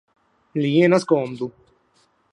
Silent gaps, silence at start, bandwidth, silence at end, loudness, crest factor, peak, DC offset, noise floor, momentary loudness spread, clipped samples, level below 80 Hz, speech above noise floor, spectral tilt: none; 0.55 s; 11 kHz; 0.85 s; -20 LUFS; 18 dB; -4 dBFS; under 0.1%; -63 dBFS; 15 LU; under 0.1%; -68 dBFS; 44 dB; -7 dB/octave